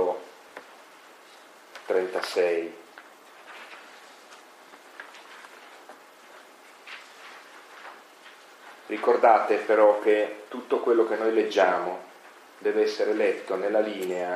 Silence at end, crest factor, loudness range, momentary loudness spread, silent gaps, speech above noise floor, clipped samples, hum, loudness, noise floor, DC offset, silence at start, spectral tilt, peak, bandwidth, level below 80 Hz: 0 s; 22 dB; 23 LU; 27 LU; none; 27 dB; under 0.1%; none; -24 LUFS; -51 dBFS; under 0.1%; 0 s; -4 dB/octave; -6 dBFS; 14 kHz; under -90 dBFS